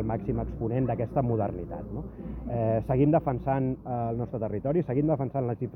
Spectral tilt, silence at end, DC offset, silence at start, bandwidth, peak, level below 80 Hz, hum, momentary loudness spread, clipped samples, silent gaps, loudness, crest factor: -12 dB/octave; 0 s; under 0.1%; 0 s; 3.4 kHz; -12 dBFS; -44 dBFS; none; 12 LU; under 0.1%; none; -29 LUFS; 16 dB